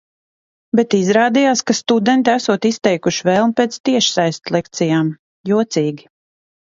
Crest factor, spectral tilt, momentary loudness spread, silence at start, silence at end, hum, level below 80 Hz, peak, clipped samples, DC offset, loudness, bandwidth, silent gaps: 16 dB; -4.5 dB/octave; 7 LU; 0.75 s; 0.65 s; none; -60 dBFS; 0 dBFS; under 0.1%; under 0.1%; -16 LUFS; 7.8 kHz; 3.80-3.84 s, 5.19-5.44 s